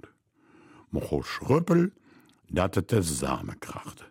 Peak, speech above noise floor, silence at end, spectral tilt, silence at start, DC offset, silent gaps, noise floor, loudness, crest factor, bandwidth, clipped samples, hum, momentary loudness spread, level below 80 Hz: -10 dBFS; 34 dB; 0.05 s; -6 dB/octave; 0.9 s; under 0.1%; none; -61 dBFS; -28 LUFS; 20 dB; 16.5 kHz; under 0.1%; none; 15 LU; -48 dBFS